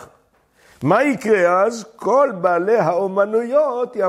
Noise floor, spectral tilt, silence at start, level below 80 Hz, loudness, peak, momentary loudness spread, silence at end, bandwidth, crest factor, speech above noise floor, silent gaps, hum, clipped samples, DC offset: -57 dBFS; -6.5 dB/octave; 0 s; -66 dBFS; -17 LUFS; -2 dBFS; 5 LU; 0 s; 13 kHz; 16 dB; 40 dB; none; none; under 0.1%; under 0.1%